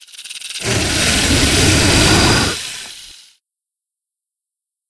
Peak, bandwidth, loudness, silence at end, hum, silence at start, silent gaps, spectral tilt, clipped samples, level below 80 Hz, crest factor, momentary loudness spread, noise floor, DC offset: 0 dBFS; 11 kHz; -12 LUFS; 1.75 s; none; 0.15 s; none; -3 dB/octave; under 0.1%; -28 dBFS; 16 dB; 18 LU; -84 dBFS; under 0.1%